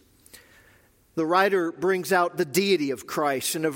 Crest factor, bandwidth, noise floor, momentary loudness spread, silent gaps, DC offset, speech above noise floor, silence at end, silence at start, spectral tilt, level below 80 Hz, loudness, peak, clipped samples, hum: 18 dB; 17 kHz; -59 dBFS; 7 LU; none; under 0.1%; 35 dB; 0 s; 0.35 s; -4 dB/octave; -68 dBFS; -24 LUFS; -6 dBFS; under 0.1%; none